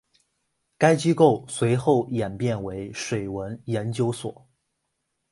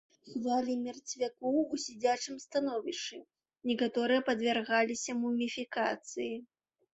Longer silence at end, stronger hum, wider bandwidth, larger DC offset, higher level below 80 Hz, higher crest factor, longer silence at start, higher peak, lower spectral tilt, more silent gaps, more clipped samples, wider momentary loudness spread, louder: first, 1 s vs 0.5 s; neither; first, 11.5 kHz vs 8.2 kHz; neither; first, -56 dBFS vs -78 dBFS; about the same, 22 dB vs 18 dB; first, 0.8 s vs 0.25 s; first, -4 dBFS vs -16 dBFS; first, -6 dB/octave vs -3 dB/octave; neither; neither; first, 13 LU vs 10 LU; first, -24 LUFS vs -33 LUFS